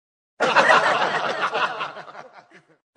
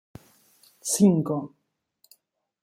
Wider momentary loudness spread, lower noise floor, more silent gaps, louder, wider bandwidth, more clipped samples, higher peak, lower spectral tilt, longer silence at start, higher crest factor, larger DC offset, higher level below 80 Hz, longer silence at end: about the same, 18 LU vs 16 LU; second, -50 dBFS vs -68 dBFS; neither; first, -20 LUFS vs -23 LUFS; second, 10 kHz vs 15.5 kHz; neither; first, -2 dBFS vs -8 dBFS; second, -2.5 dB/octave vs -6 dB/octave; second, 0.4 s vs 0.85 s; about the same, 22 dB vs 20 dB; neither; second, -74 dBFS vs -68 dBFS; second, 0.55 s vs 1.15 s